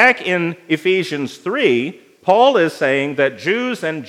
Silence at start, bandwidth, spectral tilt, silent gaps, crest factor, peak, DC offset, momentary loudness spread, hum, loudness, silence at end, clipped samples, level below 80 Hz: 0 s; 14 kHz; -5 dB/octave; none; 16 dB; 0 dBFS; under 0.1%; 10 LU; none; -17 LUFS; 0 s; under 0.1%; -76 dBFS